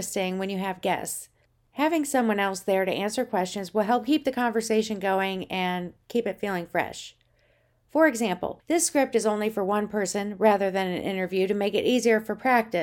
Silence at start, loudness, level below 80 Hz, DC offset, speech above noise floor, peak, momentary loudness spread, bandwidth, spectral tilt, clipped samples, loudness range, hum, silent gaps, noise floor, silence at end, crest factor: 0 s; -26 LUFS; -64 dBFS; under 0.1%; 40 dB; -8 dBFS; 7 LU; 18.5 kHz; -4 dB/octave; under 0.1%; 3 LU; none; none; -65 dBFS; 0 s; 18 dB